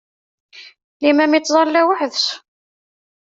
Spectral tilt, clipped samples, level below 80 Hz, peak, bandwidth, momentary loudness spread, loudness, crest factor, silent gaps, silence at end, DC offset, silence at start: -1.5 dB/octave; under 0.1%; -68 dBFS; -2 dBFS; 7.8 kHz; 7 LU; -16 LUFS; 16 dB; 0.84-1.00 s; 0.95 s; under 0.1%; 0.55 s